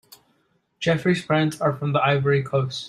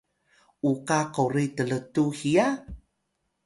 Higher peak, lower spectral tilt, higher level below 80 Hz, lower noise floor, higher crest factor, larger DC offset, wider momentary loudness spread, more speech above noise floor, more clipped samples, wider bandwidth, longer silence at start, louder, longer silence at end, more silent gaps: about the same, -6 dBFS vs -8 dBFS; about the same, -6.5 dB/octave vs -6 dB/octave; second, -60 dBFS vs -54 dBFS; second, -67 dBFS vs -77 dBFS; about the same, 16 dB vs 20 dB; neither; about the same, 4 LU vs 6 LU; second, 46 dB vs 52 dB; neither; first, 13 kHz vs 11.5 kHz; first, 0.8 s vs 0.65 s; first, -22 LUFS vs -26 LUFS; second, 0 s vs 0.65 s; neither